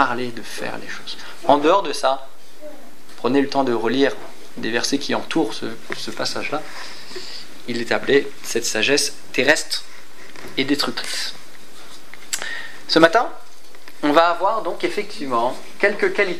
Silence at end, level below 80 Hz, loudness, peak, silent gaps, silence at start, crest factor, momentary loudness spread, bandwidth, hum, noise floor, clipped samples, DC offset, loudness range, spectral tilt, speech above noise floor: 0 s; -64 dBFS; -21 LUFS; 0 dBFS; none; 0 s; 22 dB; 18 LU; 16 kHz; none; -45 dBFS; under 0.1%; 5%; 5 LU; -3 dB/octave; 25 dB